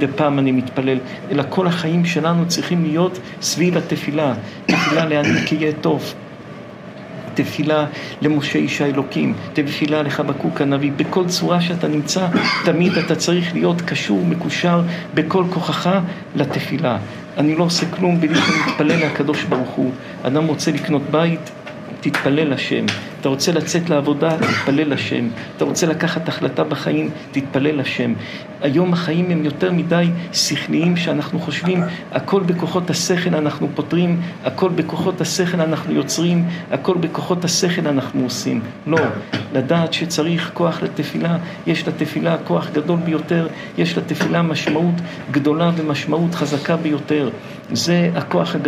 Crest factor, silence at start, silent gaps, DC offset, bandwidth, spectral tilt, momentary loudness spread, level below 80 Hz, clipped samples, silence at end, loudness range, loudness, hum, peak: 16 dB; 0 s; none; under 0.1%; 14.5 kHz; -5.5 dB/octave; 6 LU; -60 dBFS; under 0.1%; 0 s; 2 LU; -19 LUFS; none; -2 dBFS